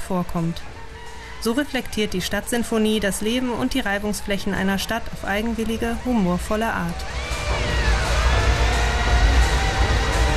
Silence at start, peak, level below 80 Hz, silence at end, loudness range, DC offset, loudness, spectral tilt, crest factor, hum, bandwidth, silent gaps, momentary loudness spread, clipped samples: 0 s; -6 dBFS; -26 dBFS; 0 s; 3 LU; 1%; -22 LUFS; -5 dB/octave; 16 dB; none; 14 kHz; none; 8 LU; under 0.1%